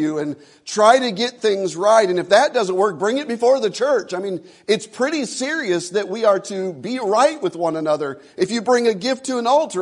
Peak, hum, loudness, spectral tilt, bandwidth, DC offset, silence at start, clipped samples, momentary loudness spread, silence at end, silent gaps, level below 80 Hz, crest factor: 0 dBFS; none; -19 LUFS; -4 dB/octave; 11 kHz; under 0.1%; 0 s; under 0.1%; 11 LU; 0 s; none; -72 dBFS; 18 dB